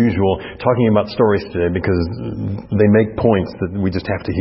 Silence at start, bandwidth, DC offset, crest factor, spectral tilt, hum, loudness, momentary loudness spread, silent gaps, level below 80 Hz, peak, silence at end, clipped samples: 0 s; 5.8 kHz; under 0.1%; 16 dB; -12 dB/octave; none; -17 LUFS; 10 LU; none; -40 dBFS; 0 dBFS; 0 s; under 0.1%